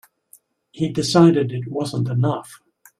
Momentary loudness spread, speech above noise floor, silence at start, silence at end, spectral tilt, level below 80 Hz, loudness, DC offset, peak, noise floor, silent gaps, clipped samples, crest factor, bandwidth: 12 LU; 36 dB; 0.75 s; 0.45 s; -6.5 dB/octave; -58 dBFS; -19 LUFS; under 0.1%; -2 dBFS; -54 dBFS; none; under 0.1%; 18 dB; 14 kHz